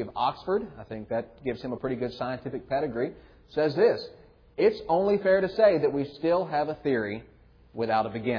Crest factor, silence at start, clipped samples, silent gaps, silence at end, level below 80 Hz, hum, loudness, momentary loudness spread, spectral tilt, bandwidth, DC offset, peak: 18 dB; 0 s; under 0.1%; none; 0 s; -58 dBFS; none; -27 LUFS; 12 LU; -8 dB/octave; 5.4 kHz; under 0.1%; -10 dBFS